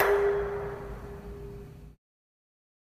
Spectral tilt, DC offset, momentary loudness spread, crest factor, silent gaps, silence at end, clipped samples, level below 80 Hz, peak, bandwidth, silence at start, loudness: -6 dB/octave; under 0.1%; 21 LU; 22 dB; none; 1.05 s; under 0.1%; -48 dBFS; -10 dBFS; 15.5 kHz; 0 s; -32 LUFS